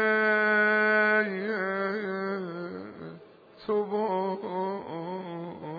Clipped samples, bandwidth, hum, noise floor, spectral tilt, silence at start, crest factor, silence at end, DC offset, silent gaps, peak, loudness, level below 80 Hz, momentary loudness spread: under 0.1%; 5 kHz; none; -51 dBFS; -8 dB/octave; 0 s; 16 dB; 0 s; under 0.1%; none; -12 dBFS; -27 LUFS; -76 dBFS; 17 LU